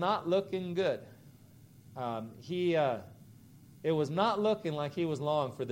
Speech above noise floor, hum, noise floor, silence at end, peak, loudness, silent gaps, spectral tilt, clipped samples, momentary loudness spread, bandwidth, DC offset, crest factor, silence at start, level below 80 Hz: 25 dB; none; -57 dBFS; 0 s; -14 dBFS; -33 LUFS; none; -7 dB/octave; under 0.1%; 11 LU; 16 kHz; under 0.1%; 18 dB; 0 s; -72 dBFS